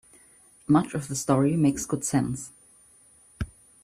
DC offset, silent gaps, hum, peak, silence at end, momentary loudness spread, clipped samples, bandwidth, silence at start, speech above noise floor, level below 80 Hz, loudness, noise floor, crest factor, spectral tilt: under 0.1%; none; none; -8 dBFS; 0.35 s; 15 LU; under 0.1%; 15 kHz; 0.7 s; 33 dB; -50 dBFS; -25 LUFS; -57 dBFS; 20 dB; -6 dB/octave